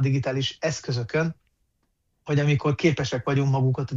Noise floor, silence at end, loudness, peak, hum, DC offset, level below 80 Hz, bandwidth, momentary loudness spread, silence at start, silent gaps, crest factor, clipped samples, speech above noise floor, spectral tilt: -72 dBFS; 0 s; -24 LUFS; -8 dBFS; none; under 0.1%; -56 dBFS; 7.6 kHz; 7 LU; 0 s; none; 16 dB; under 0.1%; 49 dB; -6 dB/octave